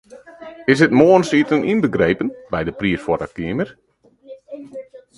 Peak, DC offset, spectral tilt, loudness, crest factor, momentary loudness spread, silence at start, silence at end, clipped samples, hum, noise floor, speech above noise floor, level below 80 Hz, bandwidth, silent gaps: 0 dBFS; under 0.1%; -6.5 dB/octave; -17 LUFS; 18 dB; 23 LU; 0.1 s; 0.2 s; under 0.1%; none; -42 dBFS; 26 dB; -48 dBFS; 11.5 kHz; none